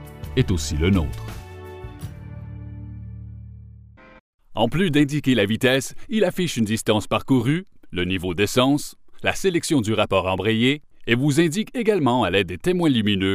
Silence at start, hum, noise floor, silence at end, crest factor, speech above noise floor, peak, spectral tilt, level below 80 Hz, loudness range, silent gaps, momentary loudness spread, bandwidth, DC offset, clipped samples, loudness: 0 s; none; -46 dBFS; 0 s; 18 dB; 25 dB; -4 dBFS; -5.5 dB/octave; -40 dBFS; 9 LU; 4.20-4.39 s; 18 LU; 15.5 kHz; under 0.1%; under 0.1%; -21 LUFS